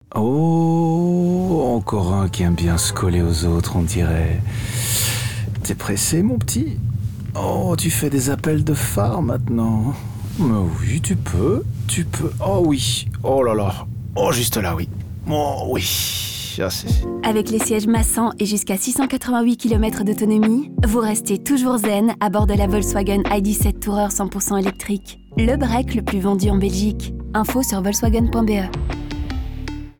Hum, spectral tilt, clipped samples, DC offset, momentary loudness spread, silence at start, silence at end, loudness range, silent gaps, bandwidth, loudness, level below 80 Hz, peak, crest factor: none; -5 dB/octave; under 0.1%; under 0.1%; 7 LU; 0.1 s; 0.1 s; 2 LU; none; over 20 kHz; -19 LUFS; -30 dBFS; -8 dBFS; 10 dB